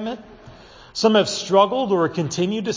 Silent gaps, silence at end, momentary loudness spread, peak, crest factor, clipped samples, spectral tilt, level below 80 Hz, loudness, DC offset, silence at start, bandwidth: none; 0 s; 14 LU; -2 dBFS; 18 dB; under 0.1%; -4.5 dB/octave; -56 dBFS; -19 LUFS; under 0.1%; 0 s; 7.6 kHz